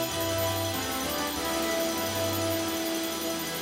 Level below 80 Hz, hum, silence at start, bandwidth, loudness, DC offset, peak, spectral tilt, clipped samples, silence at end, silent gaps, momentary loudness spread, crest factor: -54 dBFS; none; 0 s; 16 kHz; -29 LUFS; under 0.1%; -16 dBFS; -3 dB/octave; under 0.1%; 0 s; none; 2 LU; 12 dB